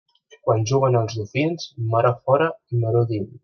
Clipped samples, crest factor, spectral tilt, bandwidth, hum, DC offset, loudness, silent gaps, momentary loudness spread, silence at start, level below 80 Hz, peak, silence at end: under 0.1%; 18 dB; -7 dB/octave; 6.6 kHz; none; under 0.1%; -21 LUFS; none; 6 LU; 0.45 s; -60 dBFS; -4 dBFS; 0.05 s